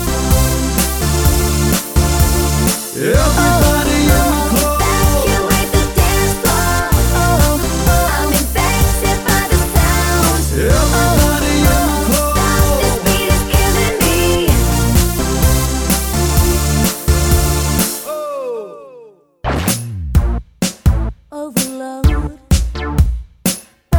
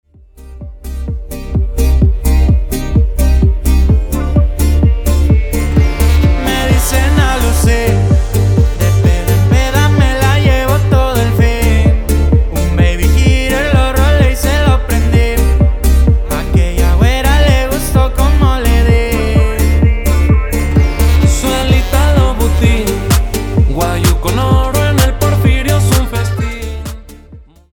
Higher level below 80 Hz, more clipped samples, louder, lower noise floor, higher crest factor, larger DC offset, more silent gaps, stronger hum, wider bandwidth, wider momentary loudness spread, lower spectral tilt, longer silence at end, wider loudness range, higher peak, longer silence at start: about the same, -18 dBFS vs -14 dBFS; neither; about the same, -14 LUFS vs -12 LUFS; first, -41 dBFS vs -37 dBFS; about the same, 14 dB vs 10 dB; neither; neither; neither; about the same, over 20 kHz vs 19.5 kHz; first, 7 LU vs 4 LU; second, -4.5 dB/octave vs -6 dB/octave; second, 0 s vs 0.35 s; first, 5 LU vs 2 LU; about the same, 0 dBFS vs 0 dBFS; second, 0 s vs 0.4 s